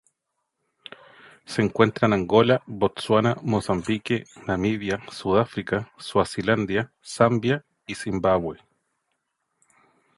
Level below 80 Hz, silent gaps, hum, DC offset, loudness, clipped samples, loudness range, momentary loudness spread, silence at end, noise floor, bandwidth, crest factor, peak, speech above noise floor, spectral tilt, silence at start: -52 dBFS; none; none; under 0.1%; -24 LUFS; under 0.1%; 3 LU; 11 LU; 1.65 s; -79 dBFS; 11.5 kHz; 22 dB; -2 dBFS; 56 dB; -6 dB/octave; 1.5 s